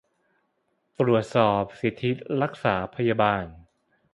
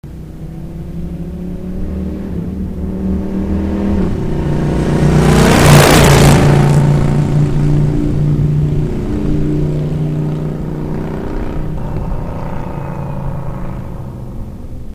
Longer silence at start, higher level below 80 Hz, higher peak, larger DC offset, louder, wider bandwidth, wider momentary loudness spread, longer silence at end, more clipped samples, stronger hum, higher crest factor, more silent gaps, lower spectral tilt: first, 1 s vs 0.05 s; second, -56 dBFS vs -22 dBFS; second, -6 dBFS vs 0 dBFS; neither; second, -25 LUFS vs -14 LUFS; second, 11.5 kHz vs 16 kHz; second, 7 LU vs 18 LU; first, 0.55 s vs 0 s; second, under 0.1% vs 0.3%; neither; first, 20 dB vs 14 dB; neither; first, -7.5 dB/octave vs -6 dB/octave